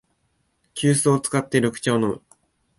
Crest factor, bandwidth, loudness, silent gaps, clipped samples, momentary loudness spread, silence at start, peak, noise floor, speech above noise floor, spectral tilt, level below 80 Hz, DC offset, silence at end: 20 dB; 12 kHz; -21 LUFS; none; under 0.1%; 10 LU; 0.75 s; -4 dBFS; -69 dBFS; 49 dB; -5 dB/octave; -60 dBFS; under 0.1%; 0.6 s